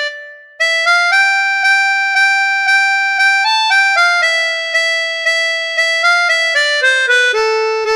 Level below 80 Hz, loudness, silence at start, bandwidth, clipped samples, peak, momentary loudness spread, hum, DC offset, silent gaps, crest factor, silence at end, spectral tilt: -68 dBFS; -11 LUFS; 0 s; 14.5 kHz; under 0.1%; -2 dBFS; 4 LU; none; 0.1%; none; 12 dB; 0 s; 3.5 dB/octave